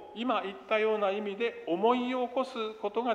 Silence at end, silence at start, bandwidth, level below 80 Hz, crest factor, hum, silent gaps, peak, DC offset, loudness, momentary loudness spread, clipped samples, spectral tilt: 0 s; 0 s; 9.8 kHz; -76 dBFS; 16 dB; none; none; -14 dBFS; under 0.1%; -31 LUFS; 6 LU; under 0.1%; -5.5 dB/octave